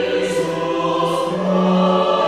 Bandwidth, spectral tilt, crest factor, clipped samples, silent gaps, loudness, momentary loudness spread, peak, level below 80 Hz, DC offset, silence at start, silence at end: 13.5 kHz; -6 dB/octave; 12 dB; under 0.1%; none; -18 LUFS; 5 LU; -4 dBFS; -58 dBFS; 0.2%; 0 s; 0 s